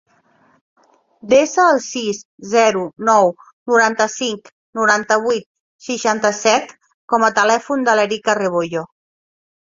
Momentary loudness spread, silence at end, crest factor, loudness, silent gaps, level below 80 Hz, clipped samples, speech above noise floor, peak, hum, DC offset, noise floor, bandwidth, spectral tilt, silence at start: 12 LU; 0.9 s; 18 dB; -16 LUFS; 2.25-2.38 s, 3.53-3.66 s, 4.52-4.73 s, 5.46-5.79 s, 6.94-7.08 s; -64 dBFS; under 0.1%; 40 dB; 0 dBFS; none; under 0.1%; -56 dBFS; 7.8 kHz; -3 dB/octave; 1.25 s